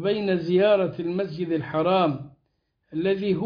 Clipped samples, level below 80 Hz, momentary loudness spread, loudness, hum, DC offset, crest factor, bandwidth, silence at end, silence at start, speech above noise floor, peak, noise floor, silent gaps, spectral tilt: under 0.1%; -62 dBFS; 8 LU; -24 LUFS; none; under 0.1%; 16 dB; 5.2 kHz; 0 s; 0 s; 50 dB; -8 dBFS; -73 dBFS; none; -9 dB/octave